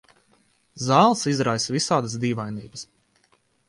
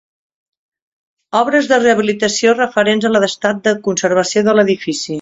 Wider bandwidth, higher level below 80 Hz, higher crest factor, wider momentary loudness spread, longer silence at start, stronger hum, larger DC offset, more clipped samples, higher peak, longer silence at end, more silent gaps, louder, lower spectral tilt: first, 11.5 kHz vs 8.2 kHz; about the same, -62 dBFS vs -58 dBFS; first, 22 dB vs 14 dB; first, 20 LU vs 5 LU; second, 0.75 s vs 1.35 s; neither; neither; neither; second, -4 dBFS vs 0 dBFS; first, 0.85 s vs 0 s; neither; second, -22 LUFS vs -14 LUFS; about the same, -4.5 dB/octave vs -3.5 dB/octave